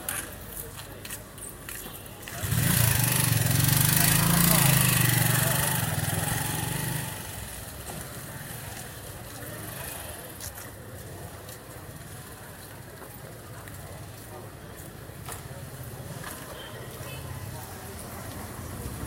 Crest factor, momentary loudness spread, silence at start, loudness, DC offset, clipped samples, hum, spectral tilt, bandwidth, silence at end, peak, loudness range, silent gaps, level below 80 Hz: 24 dB; 22 LU; 0 s; -26 LUFS; under 0.1%; under 0.1%; none; -3.5 dB/octave; 17 kHz; 0 s; -6 dBFS; 20 LU; none; -46 dBFS